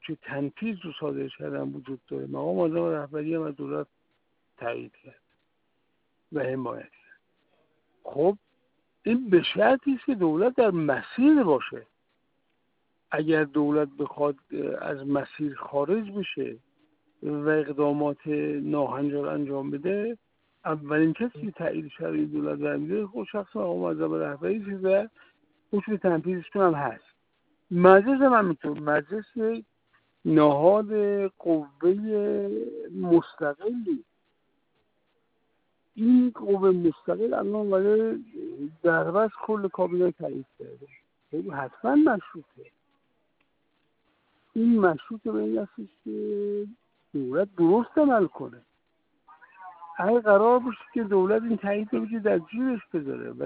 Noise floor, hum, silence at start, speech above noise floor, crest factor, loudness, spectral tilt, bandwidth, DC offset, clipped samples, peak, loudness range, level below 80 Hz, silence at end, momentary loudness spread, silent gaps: -75 dBFS; none; 0.05 s; 50 dB; 24 dB; -26 LUFS; -5.5 dB/octave; 4.7 kHz; under 0.1%; under 0.1%; -4 dBFS; 8 LU; -70 dBFS; 0 s; 14 LU; none